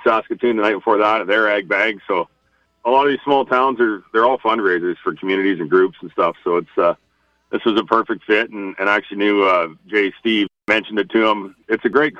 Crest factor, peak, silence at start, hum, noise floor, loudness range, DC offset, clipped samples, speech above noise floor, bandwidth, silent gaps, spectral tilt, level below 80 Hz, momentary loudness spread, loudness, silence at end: 16 dB; -2 dBFS; 0 s; none; -63 dBFS; 2 LU; under 0.1%; under 0.1%; 45 dB; 7.6 kHz; none; -6 dB/octave; -62 dBFS; 6 LU; -18 LUFS; 0 s